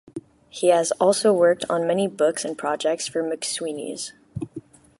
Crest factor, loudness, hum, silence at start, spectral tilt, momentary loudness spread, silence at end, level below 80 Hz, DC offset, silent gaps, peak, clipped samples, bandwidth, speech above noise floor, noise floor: 18 dB; -22 LUFS; none; 0.15 s; -4 dB/octave; 18 LU; 0.4 s; -60 dBFS; under 0.1%; none; -4 dBFS; under 0.1%; 11.5 kHz; 20 dB; -42 dBFS